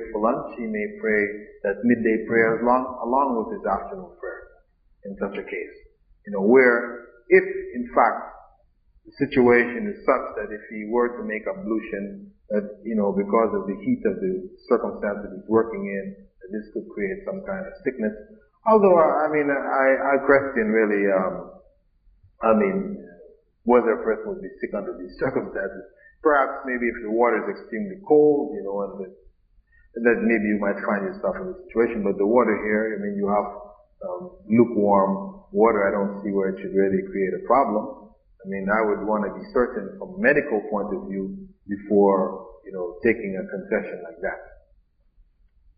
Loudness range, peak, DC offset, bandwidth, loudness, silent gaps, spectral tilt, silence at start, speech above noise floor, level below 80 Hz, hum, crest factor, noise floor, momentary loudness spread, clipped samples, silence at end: 5 LU; -4 dBFS; under 0.1%; 4.9 kHz; -23 LUFS; none; -6.5 dB/octave; 0 s; 38 dB; -54 dBFS; none; 20 dB; -61 dBFS; 15 LU; under 0.1%; 1.3 s